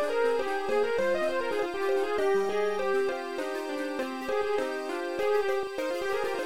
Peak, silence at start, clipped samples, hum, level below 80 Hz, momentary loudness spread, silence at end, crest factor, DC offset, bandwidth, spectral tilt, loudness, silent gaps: -16 dBFS; 0 s; under 0.1%; none; -62 dBFS; 6 LU; 0 s; 12 dB; 0.8%; 16 kHz; -4 dB/octave; -29 LUFS; none